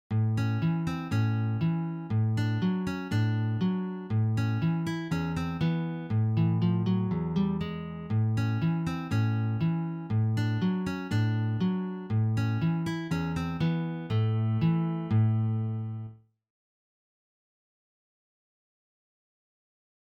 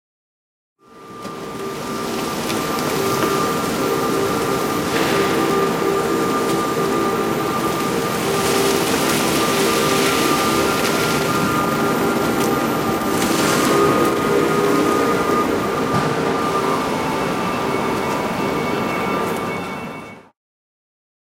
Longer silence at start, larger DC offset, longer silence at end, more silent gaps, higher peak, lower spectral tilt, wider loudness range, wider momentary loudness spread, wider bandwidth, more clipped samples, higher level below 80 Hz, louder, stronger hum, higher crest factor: second, 0.1 s vs 0.95 s; neither; first, 3.9 s vs 1.1 s; neither; second, -16 dBFS vs -4 dBFS; first, -8 dB/octave vs -4 dB/octave; second, 2 LU vs 5 LU; about the same, 5 LU vs 7 LU; second, 7.8 kHz vs 16.5 kHz; neither; second, -56 dBFS vs -48 dBFS; second, -29 LUFS vs -18 LUFS; neither; about the same, 12 dB vs 14 dB